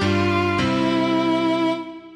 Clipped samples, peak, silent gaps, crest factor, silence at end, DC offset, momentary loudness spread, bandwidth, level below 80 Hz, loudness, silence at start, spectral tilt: under 0.1%; -8 dBFS; none; 12 dB; 0 s; under 0.1%; 3 LU; 10.5 kHz; -48 dBFS; -20 LUFS; 0 s; -6.5 dB/octave